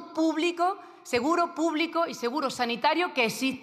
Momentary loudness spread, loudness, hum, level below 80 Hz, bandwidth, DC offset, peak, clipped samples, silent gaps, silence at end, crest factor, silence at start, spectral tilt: 4 LU; -27 LUFS; none; -74 dBFS; 14.5 kHz; under 0.1%; -10 dBFS; under 0.1%; none; 0 s; 18 dB; 0 s; -3.5 dB/octave